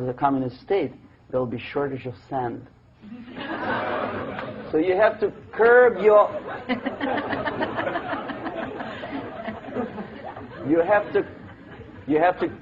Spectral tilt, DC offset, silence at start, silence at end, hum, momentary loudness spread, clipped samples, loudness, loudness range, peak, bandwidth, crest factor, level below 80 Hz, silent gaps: -8.5 dB/octave; under 0.1%; 0 s; 0 s; none; 19 LU; under 0.1%; -24 LUFS; 9 LU; -4 dBFS; 5.6 kHz; 20 dB; -56 dBFS; none